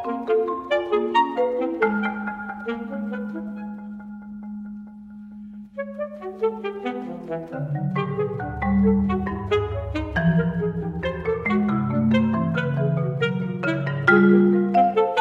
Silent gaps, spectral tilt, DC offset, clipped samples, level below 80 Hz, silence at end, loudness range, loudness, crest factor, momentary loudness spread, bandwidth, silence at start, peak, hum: none; -8.5 dB/octave; under 0.1%; under 0.1%; -42 dBFS; 0 s; 12 LU; -23 LUFS; 18 dB; 17 LU; 7.4 kHz; 0 s; -4 dBFS; none